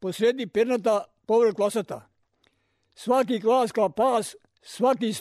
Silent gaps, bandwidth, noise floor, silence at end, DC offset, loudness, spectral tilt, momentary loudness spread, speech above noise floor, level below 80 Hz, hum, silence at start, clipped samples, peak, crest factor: none; 13.5 kHz; -69 dBFS; 0 s; under 0.1%; -24 LUFS; -5 dB/octave; 15 LU; 45 dB; -70 dBFS; none; 0 s; under 0.1%; -12 dBFS; 12 dB